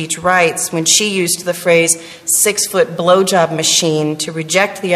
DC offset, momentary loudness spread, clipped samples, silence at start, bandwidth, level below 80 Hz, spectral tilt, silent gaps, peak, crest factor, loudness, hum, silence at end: under 0.1%; 5 LU; under 0.1%; 0 s; 15 kHz; -56 dBFS; -2.5 dB/octave; none; 0 dBFS; 14 dB; -13 LUFS; none; 0 s